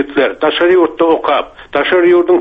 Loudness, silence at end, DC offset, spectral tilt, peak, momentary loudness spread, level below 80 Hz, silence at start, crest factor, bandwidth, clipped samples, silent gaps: -12 LUFS; 0 s; under 0.1%; -6.5 dB/octave; 0 dBFS; 7 LU; -48 dBFS; 0 s; 10 dB; 4.8 kHz; under 0.1%; none